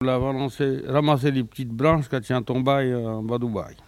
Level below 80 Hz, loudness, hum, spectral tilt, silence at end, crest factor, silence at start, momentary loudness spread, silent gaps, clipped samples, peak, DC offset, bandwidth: -48 dBFS; -24 LUFS; none; -7.5 dB/octave; 0.15 s; 18 dB; 0 s; 6 LU; none; under 0.1%; -6 dBFS; under 0.1%; 14 kHz